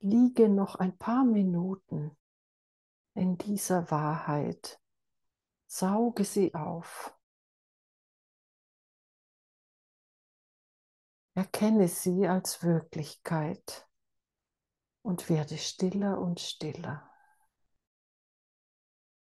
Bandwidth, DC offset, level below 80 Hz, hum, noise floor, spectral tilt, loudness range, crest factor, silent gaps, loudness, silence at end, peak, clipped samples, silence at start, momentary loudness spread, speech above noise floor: 12.5 kHz; under 0.1%; -74 dBFS; none; under -90 dBFS; -6 dB/octave; 8 LU; 20 dB; 2.20-3.05 s, 7.23-11.28 s; -30 LUFS; 2.3 s; -12 dBFS; under 0.1%; 0 s; 16 LU; over 61 dB